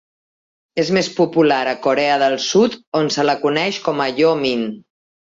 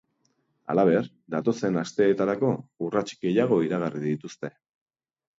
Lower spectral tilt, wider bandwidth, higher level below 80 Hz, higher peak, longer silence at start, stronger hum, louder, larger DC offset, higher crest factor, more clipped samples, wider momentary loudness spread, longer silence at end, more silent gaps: second, -4.5 dB/octave vs -7 dB/octave; about the same, 7.8 kHz vs 7.8 kHz; first, -62 dBFS vs -68 dBFS; first, -2 dBFS vs -8 dBFS; about the same, 0.75 s vs 0.7 s; neither; first, -17 LUFS vs -26 LUFS; neither; about the same, 16 dB vs 18 dB; neither; second, 5 LU vs 10 LU; second, 0.5 s vs 0.9 s; first, 2.87-2.92 s vs none